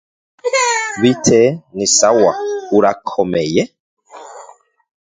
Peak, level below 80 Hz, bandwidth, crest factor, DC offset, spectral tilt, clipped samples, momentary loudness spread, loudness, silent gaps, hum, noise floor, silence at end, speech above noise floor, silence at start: 0 dBFS; -52 dBFS; 9.6 kHz; 16 dB; under 0.1%; -3.5 dB/octave; under 0.1%; 9 LU; -14 LUFS; 3.80-3.97 s; none; -43 dBFS; 0.6 s; 30 dB; 0.45 s